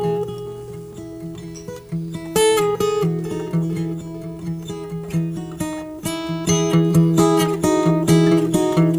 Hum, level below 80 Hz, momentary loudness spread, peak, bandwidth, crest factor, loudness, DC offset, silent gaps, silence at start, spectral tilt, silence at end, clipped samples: none; -48 dBFS; 17 LU; -4 dBFS; over 20 kHz; 16 dB; -20 LUFS; under 0.1%; none; 0 s; -6 dB/octave; 0 s; under 0.1%